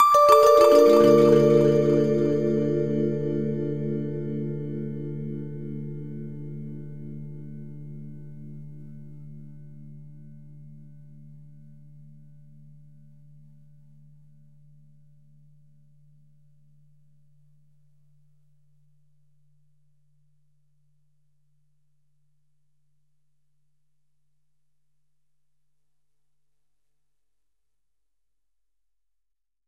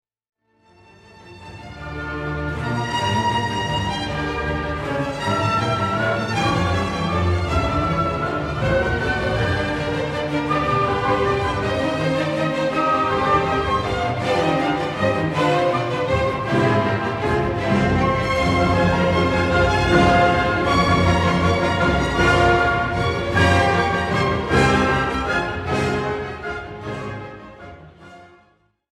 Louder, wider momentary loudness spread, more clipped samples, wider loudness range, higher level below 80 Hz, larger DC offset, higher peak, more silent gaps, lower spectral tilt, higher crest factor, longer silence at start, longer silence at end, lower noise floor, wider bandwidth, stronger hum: about the same, -21 LUFS vs -20 LUFS; first, 29 LU vs 9 LU; neither; first, 28 LU vs 7 LU; second, -62 dBFS vs -34 dBFS; first, 0.2% vs under 0.1%; about the same, -2 dBFS vs -4 dBFS; neither; about the same, -7 dB/octave vs -6 dB/octave; first, 24 dB vs 16 dB; second, 0 s vs 1.2 s; first, 19.65 s vs 0.65 s; first, -85 dBFS vs -59 dBFS; first, 15 kHz vs 12.5 kHz; neither